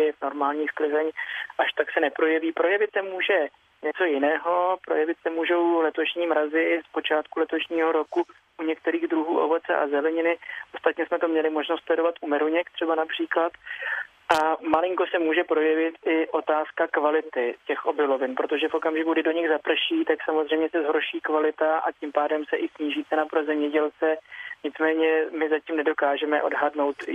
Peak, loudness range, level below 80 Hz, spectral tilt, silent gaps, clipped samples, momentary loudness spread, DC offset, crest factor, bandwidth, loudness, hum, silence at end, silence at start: -6 dBFS; 2 LU; -74 dBFS; -4 dB/octave; none; under 0.1%; 6 LU; under 0.1%; 18 dB; 8.8 kHz; -25 LUFS; none; 0 s; 0 s